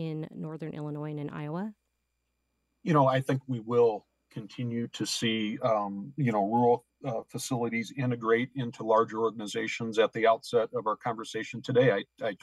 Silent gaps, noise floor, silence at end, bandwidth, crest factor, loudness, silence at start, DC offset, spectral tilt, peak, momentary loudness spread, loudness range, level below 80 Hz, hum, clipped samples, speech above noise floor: none; -80 dBFS; 0.05 s; 12.5 kHz; 18 dB; -29 LUFS; 0 s; under 0.1%; -5.5 dB/octave; -10 dBFS; 12 LU; 2 LU; -74 dBFS; none; under 0.1%; 51 dB